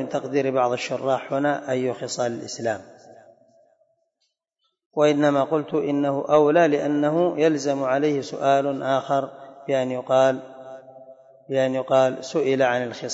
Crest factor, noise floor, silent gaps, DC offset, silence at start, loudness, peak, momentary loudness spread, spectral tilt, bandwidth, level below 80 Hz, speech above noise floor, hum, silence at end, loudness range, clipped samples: 18 dB; -75 dBFS; 4.86-4.91 s; under 0.1%; 0 s; -22 LUFS; -6 dBFS; 9 LU; -5.5 dB/octave; 8 kHz; -72 dBFS; 54 dB; none; 0 s; 7 LU; under 0.1%